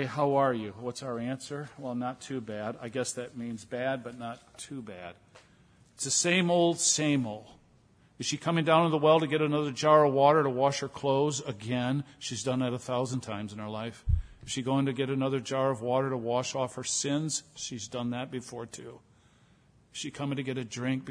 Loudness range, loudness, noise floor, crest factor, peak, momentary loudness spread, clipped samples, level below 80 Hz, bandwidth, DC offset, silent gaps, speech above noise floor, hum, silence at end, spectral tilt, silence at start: 11 LU; -29 LUFS; -62 dBFS; 22 dB; -8 dBFS; 15 LU; under 0.1%; -48 dBFS; 11 kHz; under 0.1%; none; 33 dB; none; 0 s; -4.5 dB/octave; 0 s